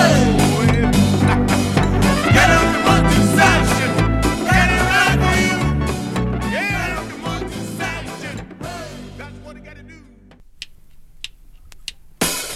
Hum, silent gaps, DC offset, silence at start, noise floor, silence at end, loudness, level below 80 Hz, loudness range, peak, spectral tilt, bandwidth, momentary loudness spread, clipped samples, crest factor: none; none; under 0.1%; 0 s; -45 dBFS; 0 s; -16 LUFS; -28 dBFS; 20 LU; 0 dBFS; -5 dB/octave; 16 kHz; 22 LU; under 0.1%; 18 dB